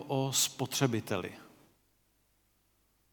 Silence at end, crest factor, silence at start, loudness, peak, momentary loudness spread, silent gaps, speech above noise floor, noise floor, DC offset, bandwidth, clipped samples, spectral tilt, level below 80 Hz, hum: 1.65 s; 24 dB; 0 s; -31 LUFS; -12 dBFS; 9 LU; none; 40 dB; -73 dBFS; under 0.1%; 19 kHz; under 0.1%; -3.5 dB/octave; -74 dBFS; 50 Hz at -70 dBFS